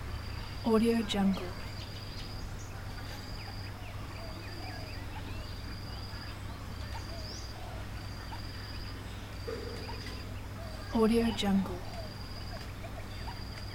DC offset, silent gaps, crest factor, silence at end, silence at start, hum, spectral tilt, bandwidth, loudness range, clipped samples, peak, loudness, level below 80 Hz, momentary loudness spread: under 0.1%; none; 20 dB; 0 s; 0 s; none; -6 dB/octave; 17 kHz; 8 LU; under 0.1%; -16 dBFS; -37 LUFS; -46 dBFS; 13 LU